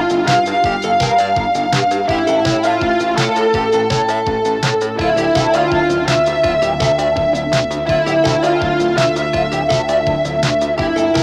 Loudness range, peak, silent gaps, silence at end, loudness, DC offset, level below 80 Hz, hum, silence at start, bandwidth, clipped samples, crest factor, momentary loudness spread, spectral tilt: 1 LU; -2 dBFS; none; 0 s; -15 LUFS; under 0.1%; -38 dBFS; none; 0 s; 11.5 kHz; under 0.1%; 14 dB; 3 LU; -5.5 dB/octave